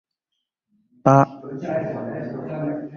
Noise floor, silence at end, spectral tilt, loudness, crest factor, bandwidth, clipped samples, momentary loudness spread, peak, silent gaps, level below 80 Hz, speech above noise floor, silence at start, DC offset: -80 dBFS; 0 s; -9 dB/octave; -22 LUFS; 22 dB; 6.8 kHz; under 0.1%; 14 LU; -2 dBFS; none; -60 dBFS; 59 dB; 1.05 s; under 0.1%